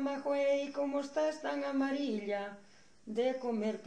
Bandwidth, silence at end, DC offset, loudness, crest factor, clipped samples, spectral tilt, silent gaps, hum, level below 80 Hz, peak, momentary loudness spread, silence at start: 9.8 kHz; 0 s; under 0.1%; -35 LUFS; 12 dB; under 0.1%; -5 dB/octave; none; none; -78 dBFS; -22 dBFS; 7 LU; 0 s